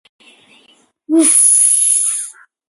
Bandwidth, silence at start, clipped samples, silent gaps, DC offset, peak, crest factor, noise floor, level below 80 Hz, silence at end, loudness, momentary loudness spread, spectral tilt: 12 kHz; 1.1 s; under 0.1%; none; under 0.1%; 0 dBFS; 16 dB; -52 dBFS; -78 dBFS; 0.4 s; -10 LUFS; 13 LU; 1 dB/octave